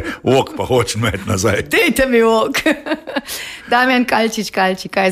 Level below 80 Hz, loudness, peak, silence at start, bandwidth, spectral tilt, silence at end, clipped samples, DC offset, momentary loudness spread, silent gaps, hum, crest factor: -42 dBFS; -16 LUFS; -2 dBFS; 0 s; 15.5 kHz; -4.5 dB/octave; 0 s; under 0.1%; under 0.1%; 9 LU; none; none; 14 dB